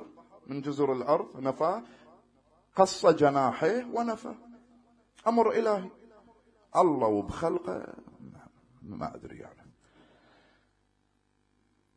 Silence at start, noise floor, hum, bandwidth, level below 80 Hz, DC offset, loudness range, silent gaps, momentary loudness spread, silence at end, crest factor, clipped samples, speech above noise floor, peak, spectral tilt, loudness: 0 s; -73 dBFS; 50 Hz at -65 dBFS; 10.5 kHz; -62 dBFS; under 0.1%; 19 LU; none; 22 LU; 2.45 s; 24 dB; under 0.1%; 45 dB; -8 dBFS; -6 dB/octave; -28 LUFS